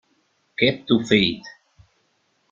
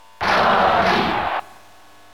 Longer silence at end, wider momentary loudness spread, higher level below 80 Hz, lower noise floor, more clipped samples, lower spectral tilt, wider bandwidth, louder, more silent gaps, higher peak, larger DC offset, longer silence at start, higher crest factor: first, 1 s vs 0.7 s; first, 16 LU vs 9 LU; second, -56 dBFS vs -46 dBFS; first, -67 dBFS vs -48 dBFS; neither; about the same, -5.5 dB/octave vs -4.5 dB/octave; second, 7.6 kHz vs 16.5 kHz; about the same, -20 LUFS vs -18 LUFS; neither; about the same, -2 dBFS vs -4 dBFS; second, under 0.1% vs 0.6%; first, 0.6 s vs 0.2 s; first, 22 dB vs 16 dB